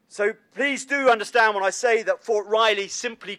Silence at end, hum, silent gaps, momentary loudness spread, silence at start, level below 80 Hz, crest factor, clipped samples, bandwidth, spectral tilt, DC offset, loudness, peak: 0.05 s; none; none; 7 LU; 0.15 s; -78 dBFS; 18 dB; under 0.1%; 13 kHz; -1.5 dB/octave; under 0.1%; -22 LUFS; -6 dBFS